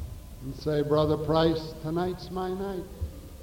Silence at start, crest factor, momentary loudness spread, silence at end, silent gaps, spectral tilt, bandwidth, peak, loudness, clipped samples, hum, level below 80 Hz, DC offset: 0 s; 16 dB; 15 LU; 0 s; none; -7 dB/octave; 17 kHz; -12 dBFS; -28 LUFS; under 0.1%; none; -44 dBFS; under 0.1%